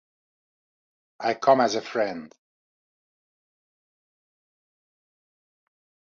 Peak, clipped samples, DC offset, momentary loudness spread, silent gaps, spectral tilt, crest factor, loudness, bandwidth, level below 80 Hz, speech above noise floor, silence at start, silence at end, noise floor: -4 dBFS; under 0.1%; under 0.1%; 10 LU; none; -4 dB/octave; 26 dB; -24 LUFS; 7.6 kHz; -78 dBFS; over 67 dB; 1.2 s; 3.85 s; under -90 dBFS